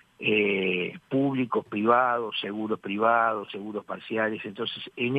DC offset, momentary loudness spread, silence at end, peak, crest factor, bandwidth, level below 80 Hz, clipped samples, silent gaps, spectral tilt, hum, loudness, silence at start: under 0.1%; 11 LU; 0 s; -8 dBFS; 18 dB; 8.4 kHz; -74 dBFS; under 0.1%; none; -7.5 dB/octave; none; -27 LUFS; 0.2 s